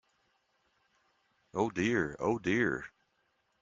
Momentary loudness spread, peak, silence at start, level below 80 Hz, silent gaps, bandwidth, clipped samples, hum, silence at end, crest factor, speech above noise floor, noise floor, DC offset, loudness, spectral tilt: 11 LU; -16 dBFS; 1.55 s; -66 dBFS; none; 7.6 kHz; under 0.1%; none; 0.75 s; 20 dB; 45 dB; -76 dBFS; under 0.1%; -32 LUFS; -6 dB/octave